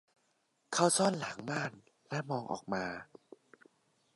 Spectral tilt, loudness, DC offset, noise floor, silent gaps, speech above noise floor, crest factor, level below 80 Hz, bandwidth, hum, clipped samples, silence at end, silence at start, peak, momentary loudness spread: -3.5 dB/octave; -34 LUFS; under 0.1%; -77 dBFS; none; 43 dB; 24 dB; -76 dBFS; 11.5 kHz; none; under 0.1%; 1.1 s; 0.7 s; -14 dBFS; 13 LU